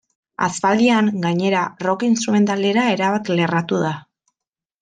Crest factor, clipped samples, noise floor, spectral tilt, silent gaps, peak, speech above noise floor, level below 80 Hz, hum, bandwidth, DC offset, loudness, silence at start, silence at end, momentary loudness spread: 16 dB; under 0.1%; -86 dBFS; -5.5 dB/octave; none; -4 dBFS; 68 dB; -64 dBFS; none; 9.8 kHz; under 0.1%; -18 LUFS; 0.4 s; 0.8 s; 7 LU